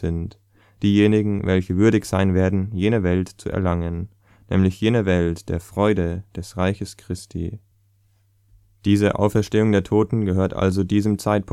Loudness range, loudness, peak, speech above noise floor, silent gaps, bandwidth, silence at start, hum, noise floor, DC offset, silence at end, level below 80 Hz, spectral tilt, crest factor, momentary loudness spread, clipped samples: 6 LU; -21 LUFS; -2 dBFS; 41 dB; none; 14 kHz; 0 s; none; -60 dBFS; under 0.1%; 0 s; -42 dBFS; -7.5 dB/octave; 18 dB; 13 LU; under 0.1%